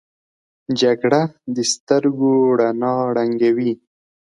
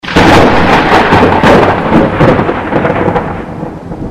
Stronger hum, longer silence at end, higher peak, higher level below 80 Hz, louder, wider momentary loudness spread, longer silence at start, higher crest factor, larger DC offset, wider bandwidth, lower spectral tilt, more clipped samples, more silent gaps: neither; first, 0.6 s vs 0 s; about the same, -2 dBFS vs 0 dBFS; second, -66 dBFS vs -24 dBFS; second, -18 LUFS vs -7 LUFS; second, 8 LU vs 15 LU; first, 0.7 s vs 0.05 s; first, 16 dB vs 8 dB; neither; second, 11.5 kHz vs 15.5 kHz; second, -5 dB/octave vs -6.5 dB/octave; second, under 0.1% vs 3%; first, 1.80-1.87 s vs none